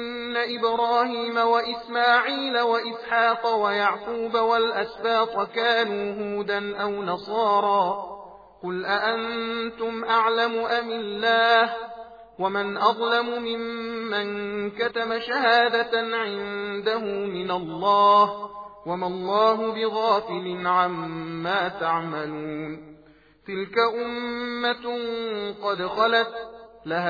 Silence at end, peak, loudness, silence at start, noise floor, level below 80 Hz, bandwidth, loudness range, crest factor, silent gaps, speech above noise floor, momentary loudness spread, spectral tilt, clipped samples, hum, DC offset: 0 s; -6 dBFS; -24 LUFS; 0 s; -54 dBFS; -64 dBFS; 5 kHz; 5 LU; 20 dB; none; 30 dB; 11 LU; -5.5 dB/octave; under 0.1%; none; under 0.1%